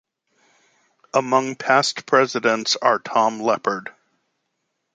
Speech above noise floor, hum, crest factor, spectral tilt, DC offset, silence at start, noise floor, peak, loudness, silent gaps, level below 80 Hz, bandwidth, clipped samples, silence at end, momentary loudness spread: 56 dB; none; 20 dB; -3 dB/octave; under 0.1%; 1.15 s; -75 dBFS; -2 dBFS; -20 LUFS; none; -74 dBFS; 9.4 kHz; under 0.1%; 1.05 s; 6 LU